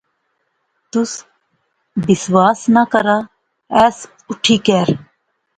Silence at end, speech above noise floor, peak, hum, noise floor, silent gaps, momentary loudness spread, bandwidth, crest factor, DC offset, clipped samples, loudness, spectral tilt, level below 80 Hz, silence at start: 0.55 s; 54 dB; 0 dBFS; none; -68 dBFS; none; 14 LU; 9.4 kHz; 16 dB; under 0.1%; under 0.1%; -15 LUFS; -5 dB/octave; -54 dBFS; 0.95 s